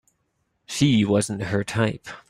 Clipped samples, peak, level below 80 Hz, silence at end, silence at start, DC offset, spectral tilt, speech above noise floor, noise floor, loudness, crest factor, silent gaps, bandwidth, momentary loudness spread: under 0.1%; -8 dBFS; -54 dBFS; 0.1 s; 0.7 s; under 0.1%; -5.5 dB/octave; 50 dB; -72 dBFS; -23 LUFS; 16 dB; none; 15 kHz; 7 LU